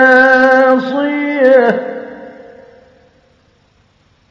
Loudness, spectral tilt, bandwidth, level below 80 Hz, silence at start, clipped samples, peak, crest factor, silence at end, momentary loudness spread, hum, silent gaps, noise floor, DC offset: -10 LUFS; -5.5 dB/octave; 6.8 kHz; -58 dBFS; 0 s; 0.2%; 0 dBFS; 12 dB; 2 s; 20 LU; none; none; -53 dBFS; under 0.1%